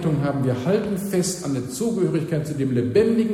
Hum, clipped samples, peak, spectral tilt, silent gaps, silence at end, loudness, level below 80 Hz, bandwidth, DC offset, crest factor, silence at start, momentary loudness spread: none; under 0.1%; -6 dBFS; -6.5 dB/octave; none; 0 s; -22 LUFS; -52 dBFS; 16 kHz; under 0.1%; 16 dB; 0 s; 6 LU